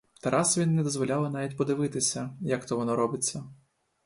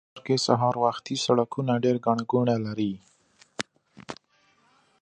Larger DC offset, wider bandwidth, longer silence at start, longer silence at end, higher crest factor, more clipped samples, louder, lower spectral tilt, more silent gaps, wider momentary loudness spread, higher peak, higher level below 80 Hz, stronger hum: neither; first, 11.5 kHz vs 10 kHz; about the same, 0.25 s vs 0.15 s; second, 0.5 s vs 0.9 s; about the same, 18 dB vs 22 dB; neither; about the same, -28 LUFS vs -26 LUFS; about the same, -4.5 dB/octave vs -5.5 dB/octave; neither; second, 7 LU vs 19 LU; second, -12 dBFS vs -4 dBFS; about the same, -66 dBFS vs -68 dBFS; neither